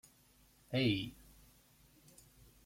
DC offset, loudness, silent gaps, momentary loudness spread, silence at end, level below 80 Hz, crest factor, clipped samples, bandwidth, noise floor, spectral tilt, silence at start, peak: under 0.1%; -37 LUFS; none; 27 LU; 1.55 s; -66 dBFS; 20 dB; under 0.1%; 16.5 kHz; -68 dBFS; -6 dB/octave; 0.7 s; -22 dBFS